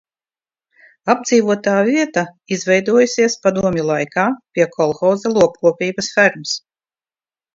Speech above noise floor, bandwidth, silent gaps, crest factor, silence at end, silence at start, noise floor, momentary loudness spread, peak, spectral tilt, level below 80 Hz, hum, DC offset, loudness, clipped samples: over 74 dB; 7.8 kHz; none; 18 dB; 0.95 s; 1.05 s; under -90 dBFS; 8 LU; 0 dBFS; -4.5 dB/octave; -56 dBFS; none; under 0.1%; -16 LUFS; under 0.1%